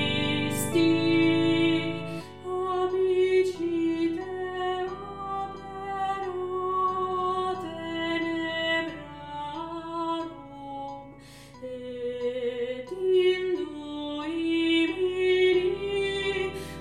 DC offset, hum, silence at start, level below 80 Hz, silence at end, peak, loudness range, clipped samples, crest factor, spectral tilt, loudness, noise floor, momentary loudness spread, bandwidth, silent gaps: 0.1%; none; 0 s; -60 dBFS; 0 s; -12 dBFS; 9 LU; under 0.1%; 16 dB; -5 dB/octave; -27 LUFS; -48 dBFS; 15 LU; 15.5 kHz; none